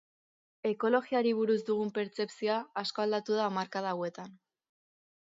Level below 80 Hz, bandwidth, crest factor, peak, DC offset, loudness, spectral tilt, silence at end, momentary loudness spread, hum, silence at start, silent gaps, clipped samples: -82 dBFS; 7.8 kHz; 18 dB; -14 dBFS; under 0.1%; -32 LUFS; -5.5 dB/octave; 0.9 s; 8 LU; none; 0.65 s; none; under 0.1%